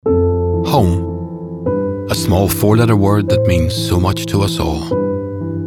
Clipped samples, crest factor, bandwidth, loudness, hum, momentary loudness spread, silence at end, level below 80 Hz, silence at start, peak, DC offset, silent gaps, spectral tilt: under 0.1%; 14 dB; 18 kHz; -15 LUFS; none; 9 LU; 0 s; -32 dBFS; 0.05 s; -2 dBFS; under 0.1%; none; -6.5 dB/octave